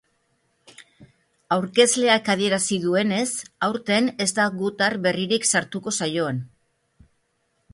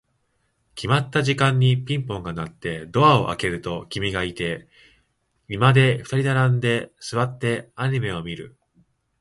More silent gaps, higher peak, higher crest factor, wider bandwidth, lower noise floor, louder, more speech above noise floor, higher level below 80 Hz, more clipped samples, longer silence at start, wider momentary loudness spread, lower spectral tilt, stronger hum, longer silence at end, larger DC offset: neither; about the same, -4 dBFS vs -2 dBFS; about the same, 20 dB vs 20 dB; about the same, 11.5 kHz vs 11.5 kHz; about the same, -70 dBFS vs -69 dBFS; about the same, -22 LUFS vs -22 LUFS; about the same, 48 dB vs 48 dB; second, -64 dBFS vs -50 dBFS; neither; about the same, 0.8 s vs 0.75 s; second, 8 LU vs 14 LU; second, -3 dB/octave vs -6 dB/octave; neither; first, 1.25 s vs 0.7 s; neither